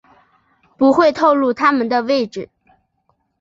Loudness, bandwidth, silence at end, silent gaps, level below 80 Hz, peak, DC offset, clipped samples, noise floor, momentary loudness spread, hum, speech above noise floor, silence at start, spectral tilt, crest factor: -15 LUFS; 7.6 kHz; 0.95 s; none; -60 dBFS; -2 dBFS; under 0.1%; under 0.1%; -65 dBFS; 14 LU; none; 51 dB; 0.8 s; -5.5 dB/octave; 16 dB